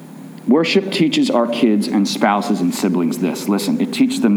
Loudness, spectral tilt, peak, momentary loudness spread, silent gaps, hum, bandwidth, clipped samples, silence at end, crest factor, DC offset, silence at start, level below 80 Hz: -17 LUFS; -5 dB/octave; -2 dBFS; 4 LU; none; none; over 20 kHz; under 0.1%; 0 s; 14 dB; under 0.1%; 0 s; -70 dBFS